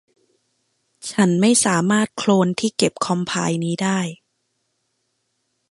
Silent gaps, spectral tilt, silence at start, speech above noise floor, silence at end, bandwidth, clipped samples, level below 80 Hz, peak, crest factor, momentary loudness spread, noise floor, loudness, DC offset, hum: none; -4.5 dB/octave; 1.05 s; 53 dB; 1.55 s; 11.5 kHz; under 0.1%; -64 dBFS; -2 dBFS; 18 dB; 9 LU; -72 dBFS; -19 LUFS; under 0.1%; none